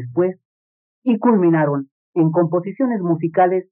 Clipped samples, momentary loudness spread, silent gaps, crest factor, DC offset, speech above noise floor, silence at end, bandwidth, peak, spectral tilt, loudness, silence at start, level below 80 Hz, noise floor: under 0.1%; 8 LU; 0.45-1.02 s, 1.91-2.13 s; 16 dB; under 0.1%; over 73 dB; 0.1 s; 3.4 kHz; -4 dBFS; -9 dB/octave; -18 LUFS; 0 s; -74 dBFS; under -90 dBFS